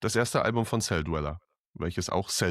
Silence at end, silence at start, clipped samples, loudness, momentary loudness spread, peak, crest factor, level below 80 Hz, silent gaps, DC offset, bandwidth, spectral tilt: 0 s; 0 s; under 0.1%; -29 LUFS; 10 LU; -12 dBFS; 18 dB; -46 dBFS; 1.59-1.74 s; under 0.1%; 14.5 kHz; -4.5 dB/octave